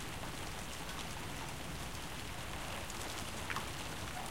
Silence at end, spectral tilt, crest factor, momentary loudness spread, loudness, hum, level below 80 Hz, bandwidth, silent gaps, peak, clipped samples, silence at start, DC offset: 0 s; -3 dB/octave; 22 dB; 3 LU; -43 LUFS; none; -52 dBFS; 17 kHz; none; -22 dBFS; under 0.1%; 0 s; 0.3%